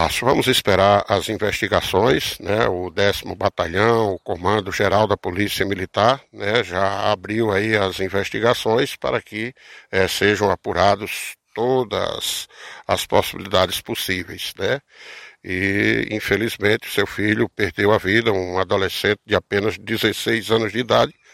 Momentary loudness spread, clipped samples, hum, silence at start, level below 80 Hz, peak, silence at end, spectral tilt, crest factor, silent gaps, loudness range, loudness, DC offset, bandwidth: 7 LU; under 0.1%; none; 0 s; -48 dBFS; 0 dBFS; 0.25 s; -4.5 dB/octave; 20 dB; none; 3 LU; -20 LUFS; under 0.1%; 16.5 kHz